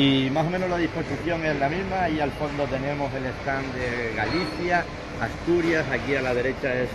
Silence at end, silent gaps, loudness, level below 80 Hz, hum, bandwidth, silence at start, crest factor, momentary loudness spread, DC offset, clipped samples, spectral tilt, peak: 0 s; none; -25 LUFS; -42 dBFS; none; 12.5 kHz; 0 s; 16 dB; 6 LU; under 0.1%; under 0.1%; -6 dB/octave; -8 dBFS